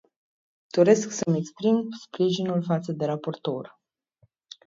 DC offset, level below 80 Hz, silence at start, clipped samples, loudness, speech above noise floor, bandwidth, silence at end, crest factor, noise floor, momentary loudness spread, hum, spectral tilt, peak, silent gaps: under 0.1%; -72 dBFS; 0.75 s; under 0.1%; -25 LUFS; 42 dB; 7.8 kHz; 0.95 s; 20 dB; -66 dBFS; 12 LU; none; -6 dB/octave; -6 dBFS; none